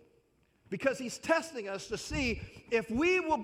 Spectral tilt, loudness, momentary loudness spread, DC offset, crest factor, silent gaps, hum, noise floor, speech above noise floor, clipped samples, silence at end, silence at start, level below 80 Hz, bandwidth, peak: -4.5 dB/octave; -33 LUFS; 11 LU; under 0.1%; 20 dB; none; none; -70 dBFS; 37 dB; under 0.1%; 0 s; 0.7 s; -52 dBFS; 15.5 kHz; -14 dBFS